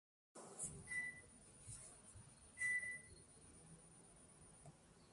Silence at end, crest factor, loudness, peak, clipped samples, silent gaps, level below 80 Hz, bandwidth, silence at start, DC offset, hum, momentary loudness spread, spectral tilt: 0 s; 18 dB; -47 LUFS; -34 dBFS; under 0.1%; none; -74 dBFS; 11.5 kHz; 0.35 s; under 0.1%; none; 21 LU; -2 dB/octave